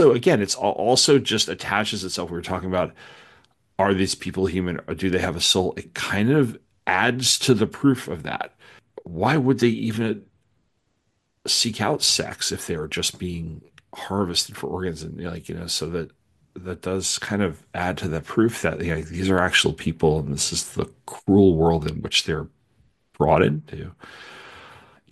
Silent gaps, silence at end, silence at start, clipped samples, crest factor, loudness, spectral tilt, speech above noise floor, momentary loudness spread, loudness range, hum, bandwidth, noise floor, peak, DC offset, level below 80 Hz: none; 0.4 s; 0 s; under 0.1%; 20 dB; -22 LUFS; -4 dB/octave; 49 dB; 15 LU; 6 LU; none; 12.5 kHz; -71 dBFS; -4 dBFS; under 0.1%; -50 dBFS